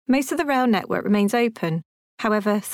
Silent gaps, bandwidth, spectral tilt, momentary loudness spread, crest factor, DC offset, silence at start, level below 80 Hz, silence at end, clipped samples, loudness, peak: 1.85-2.18 s; 17.5 kHz; -5.5 dB/octave; 7 LU; 12 dB; under 0.1%; 0.1 s; -62 dBFS; 0 s; under 0.1%; -22 LUFS; -10 dBFS